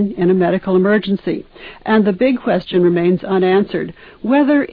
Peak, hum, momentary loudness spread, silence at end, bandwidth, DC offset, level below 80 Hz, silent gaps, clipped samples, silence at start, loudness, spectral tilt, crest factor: -4 dBFS; none; 12 LU; 0.05 s; 5 kHz; under 0.1%; -48 dBFS; none; under 0.1%; 0 s; -15 LUFS; -10.5 dB/octave; 12 dB